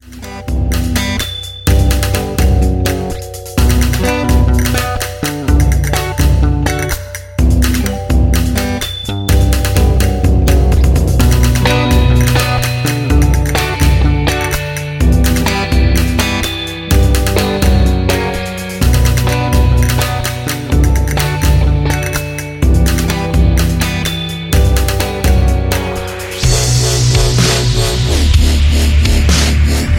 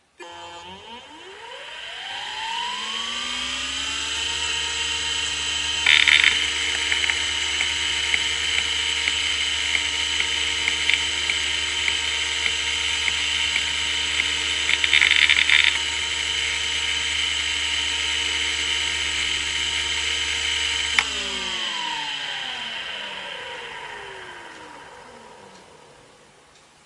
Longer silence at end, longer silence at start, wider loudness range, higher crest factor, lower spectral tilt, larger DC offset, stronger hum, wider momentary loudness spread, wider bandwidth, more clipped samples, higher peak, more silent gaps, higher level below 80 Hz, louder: second, 0 s vs 1.1 s; second, 0.05 s vs 0.2 s; second, 3 LU vs 12 LU; second, 12 dB vs 24 dB; first, -5 dB/octave vs 0.5 dB/octave; neither; neither; second, 7 LU vs 19 LU; first, 17 kHz vs 11.5 kHz; neither; about the same, 0 dBFS vs 0 dBFS; neither; first, -14 dBFS vs -48 dBFS; first, -13 LUFS vs -20 LUFS